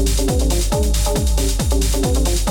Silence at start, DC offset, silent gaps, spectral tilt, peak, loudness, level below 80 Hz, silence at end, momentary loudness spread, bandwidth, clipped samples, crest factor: 0 s; under 0.1%; none; -4.5 dB/octave; -6 dBFS; -18 LUFS; -18 dBFS; 0 s; 1 LU; 17.5 kHz; under 0.1%; 10 dB